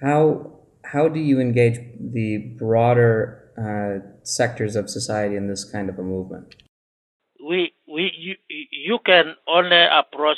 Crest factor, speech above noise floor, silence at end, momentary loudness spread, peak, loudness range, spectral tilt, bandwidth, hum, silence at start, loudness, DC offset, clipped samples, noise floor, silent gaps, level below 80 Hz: 20 dB; over 70 dB; 0 s; 16 LU; 0 dBFS; 8 LU; -5 dB/octave; 12 kHz; none; 0 s; -20 LUFS; under 0.1%; under 0.1%; under -90 dBFS; 6.69-7.20 s; -62 dBFS